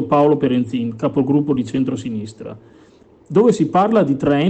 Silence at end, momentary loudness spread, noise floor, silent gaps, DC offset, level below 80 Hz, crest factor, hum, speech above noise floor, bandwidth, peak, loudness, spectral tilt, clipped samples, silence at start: 0 s; 13 LU; -48 dBFS; none; under 0.1%; -52 dBFS; 14 dB; none; 32 dB; 8.8 kHz; -2 dBFS; -17 LUFS; -7.5 dB/octave; under 0.1%; 0 s